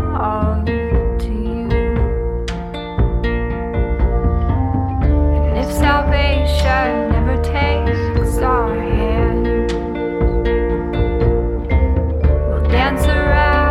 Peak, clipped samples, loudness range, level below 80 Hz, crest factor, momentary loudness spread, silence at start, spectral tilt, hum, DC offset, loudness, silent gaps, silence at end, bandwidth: 0 dBFS; under 0.1%; 3 LU; -18 dBFS; 14 dB; 6 LU; 0 s; -7 dB/octave; none; under 0.1%; -17 LUFS; none; 0 s; 12.5 kHz